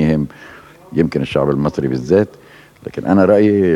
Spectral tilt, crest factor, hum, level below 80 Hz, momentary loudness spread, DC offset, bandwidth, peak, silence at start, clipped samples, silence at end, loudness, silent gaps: -8.5 dB/octave; 16 dB; none; -42 dBFS; 13 LU; under 0.1%; 11.5 kHz; 0 dBFS; 0 s; under 0.1%; 0 s; -16 LUFS; none